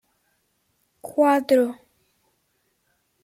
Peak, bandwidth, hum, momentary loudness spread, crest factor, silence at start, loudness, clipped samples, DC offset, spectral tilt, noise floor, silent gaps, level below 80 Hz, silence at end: -6 dBFS; 16.5 kHz; none; 24 LU; 18 dB; 1.05 s; -21 LUFS; under 0.1%; under 0.1%; -4.5 dB/octave; -70 dBFS; none; -76 dBFS; 1.5 s